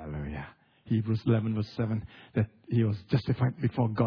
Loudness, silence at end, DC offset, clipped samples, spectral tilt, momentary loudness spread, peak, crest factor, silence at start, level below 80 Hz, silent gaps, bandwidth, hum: -30 LUFS; 0 s; under 0.1%; under 0.1%; -10 dB/octave; 10 LU; -12 dBFS; 16 dB; 0 s; -52 dBFS; none; 5.4 kHz; none